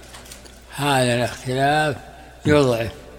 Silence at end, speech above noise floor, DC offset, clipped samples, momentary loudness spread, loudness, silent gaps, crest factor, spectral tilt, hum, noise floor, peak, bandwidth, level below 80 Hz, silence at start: 0 s; 22 dB; under 0.1%; under 0.1%; 21 LU; -20 LUFS; none; 18 dB; -5 dB/octave; none; -41 dBFS; -4 dBFS; 17 kHz; -46 dBFS; 0 s